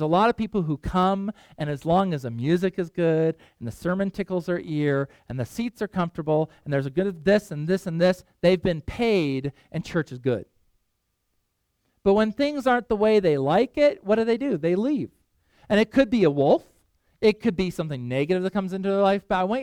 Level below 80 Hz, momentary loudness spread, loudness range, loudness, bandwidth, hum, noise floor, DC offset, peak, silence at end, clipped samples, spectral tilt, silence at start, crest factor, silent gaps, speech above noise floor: -50 dBFS; 9 LU; 5 LU; -24 LUFS; 15.5 kHz; none; -75 dBFS; under 0.1%; -6 dBFS; 0 s; under 0.1%; -7 dB/octave; 0 s; 18 dB; none; 52 dB